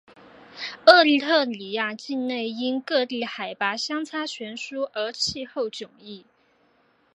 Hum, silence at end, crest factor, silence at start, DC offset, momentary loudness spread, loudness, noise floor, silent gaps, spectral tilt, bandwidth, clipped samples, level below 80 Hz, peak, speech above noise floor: none; 0.95 s; 24 dB; 0.55 s; under 0.1%; 19 LU; -23 LUFS; -63 dBFS; none; -2.5 dB/octave; 10.5 kHz; under 0.1%; -66 dBFS; 0 dBFS; 40 dB